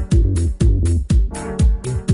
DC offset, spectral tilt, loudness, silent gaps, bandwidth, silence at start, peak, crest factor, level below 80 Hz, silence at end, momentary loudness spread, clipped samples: under 0.1%; -7 dB/octave; -18 LUFS; none; 11 kHz; 0 s; -4 dBFS; 12 dB; -18 dBFS; 0 s; 4 LU; under 0.1%